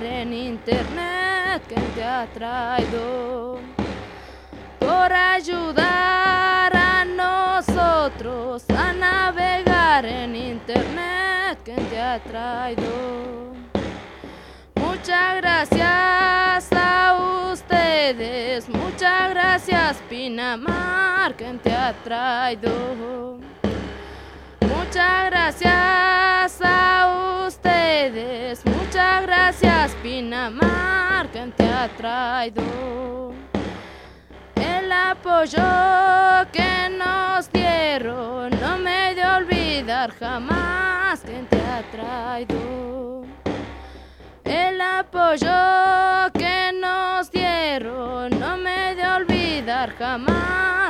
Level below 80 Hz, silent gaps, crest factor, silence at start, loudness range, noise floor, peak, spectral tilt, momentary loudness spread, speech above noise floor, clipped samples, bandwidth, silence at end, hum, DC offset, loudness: -40 dBFS; none; 20 dB; 0 s; 8 LU; -43 dBFS; 0 dBFS; -5 dB/octave; 13 LU; 23 dB; under 0.1%; 14.5 kHz; 0 s; none; under 0.1%; -20 LUFS